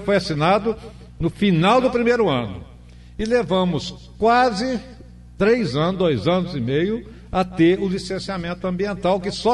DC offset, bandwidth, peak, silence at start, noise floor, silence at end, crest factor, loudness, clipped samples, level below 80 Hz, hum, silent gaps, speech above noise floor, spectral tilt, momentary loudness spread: under 0.1%; 11.5 kHz; -6 dBFS; 0 s; -42 dBFS; 0 s; 16 dB; -20 LUFS; under 0.1%; -42 dBFS; 60 Hz at -40 dBFS; none; 23 dB; -6.5 dB/octave; 11 LU